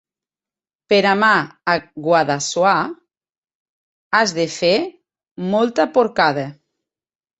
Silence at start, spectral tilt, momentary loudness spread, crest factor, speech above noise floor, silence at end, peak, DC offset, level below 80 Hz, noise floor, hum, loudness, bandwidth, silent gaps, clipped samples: 0.9 s; -4 dB/octave; 8 LU; 18 dB; over 73 dB; 0.9 s; -2 dBFS; under 0.1%; -62 dBFS; under -90 dBFS; none; -17 LUFS; 8.2 kHz; 3.38-3.42 s, 3.55-4.11 s, 5.31-5.36 s; under 0.1%